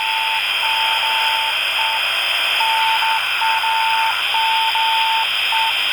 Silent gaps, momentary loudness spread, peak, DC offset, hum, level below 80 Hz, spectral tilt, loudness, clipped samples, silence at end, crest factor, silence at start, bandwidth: none; 1 LU; -4 dBFS; under 0.1%; 50 Hz at -55 dBFS; -62 dBFS; 1.5 dB/octave; -16 LUFS; under 0.1%; 0 s; 14 dB; 0 s; 17.5 kHz